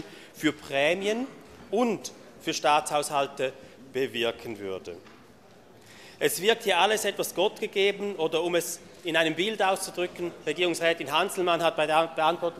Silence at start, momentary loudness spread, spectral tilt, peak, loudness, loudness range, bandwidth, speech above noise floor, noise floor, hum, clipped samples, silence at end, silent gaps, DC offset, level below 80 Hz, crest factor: 0 s; 12 LU; -3 dB/octave; -8 dBFS; -27 LUFS; 4 LU; 15 kHz; 27 dB; -54 dBFS; none; under 0.1%; 0 s; none; under 0.1%; -68 dBFS; 20 dB